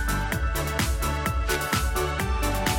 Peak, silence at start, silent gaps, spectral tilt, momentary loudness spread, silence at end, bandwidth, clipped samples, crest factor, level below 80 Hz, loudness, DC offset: -8 dBFS; 0 s; none; -4 dB/octave; 2 LU; 0 s; 17 kHz; under 0.1%; 16 dB; -28 dBFS; -26 LUFS; under 0.1%